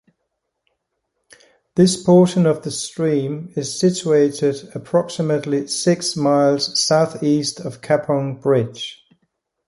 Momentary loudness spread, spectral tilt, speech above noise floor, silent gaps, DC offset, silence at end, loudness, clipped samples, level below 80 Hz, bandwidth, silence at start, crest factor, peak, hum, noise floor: 11 LU; -5 dB/octave; 58 dB; none; under 0.1%; 0.75 s; -18 LUFS; under 0.1%; -62 dBFS; 11.5 kHz; 1.75 s; 16 dB; -2 dBFS; none; -75 dBFS